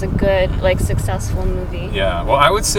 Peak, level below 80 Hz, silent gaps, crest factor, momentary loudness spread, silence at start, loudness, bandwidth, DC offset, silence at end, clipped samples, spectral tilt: 0 dBFS; -22 dBFS; none; 16 dB; 9 LU; 0 s; -17 LUFS; 18 kHz; under 0.1%; 0 s; under 0.1%; -4.5 dB/octave